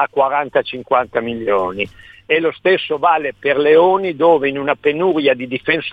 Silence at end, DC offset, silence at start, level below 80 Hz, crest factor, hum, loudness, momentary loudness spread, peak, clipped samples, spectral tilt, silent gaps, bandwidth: 0 s; under 0.1%; 0 s; -54 dBFS; 16 dB; none; -16 LUFS; 8 LU; 0 dBFS; under 0.1%; -7 dB/octave; none; 4.9 kHz